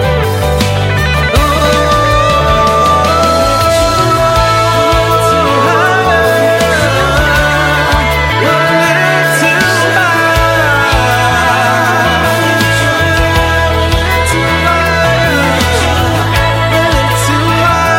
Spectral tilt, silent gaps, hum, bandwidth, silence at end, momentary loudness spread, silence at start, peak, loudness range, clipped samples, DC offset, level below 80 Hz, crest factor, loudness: -4.5 dB/octave; none; none; 16.5 kHz; 0 s; 2 LU; 0 s; 0 dBFS; 1 LU; under 0.1%; under 0.1%; -22 dBFS; 10 dB; -9 LUFS